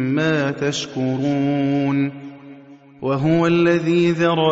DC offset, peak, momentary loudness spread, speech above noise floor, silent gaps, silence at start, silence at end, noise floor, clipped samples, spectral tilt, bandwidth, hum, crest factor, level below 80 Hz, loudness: under 0.1%; -4 dBFS; 8 LU; 25 dB; none; 0 s; 0 s; -43 dBFS; under 0.1%; -6.5 dB/octave; 8 kHz; none; 14 dB; -58 dBFS; -19 LUFS